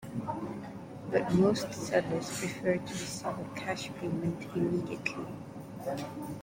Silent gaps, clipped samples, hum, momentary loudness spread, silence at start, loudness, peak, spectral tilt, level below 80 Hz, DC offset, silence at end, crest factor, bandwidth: none; under 0.1%; none; 12 LU; 0 s; -33 LUFS; -14 dBFS; -5.5 dB/octave; -62 dBFS; under 0.1%; 0 s; 20 dB; 16.5 kHz